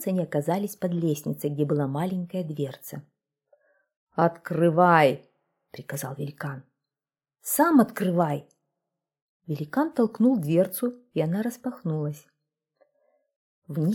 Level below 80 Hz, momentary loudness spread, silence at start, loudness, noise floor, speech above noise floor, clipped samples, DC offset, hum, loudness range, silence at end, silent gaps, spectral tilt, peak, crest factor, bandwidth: -72 dBFS; 16 LU; 0 s; -26 LUFS; under -90 dBFS; over 65 dB; under 0.1%; under 0.1%; none; 5 LU; 0 s; 3.97-4.07 s, 9.22-9.40 s, 13.36-13.62 s; -6.5 dB/octave; -4 dBFS; 22 dB; 18 kHz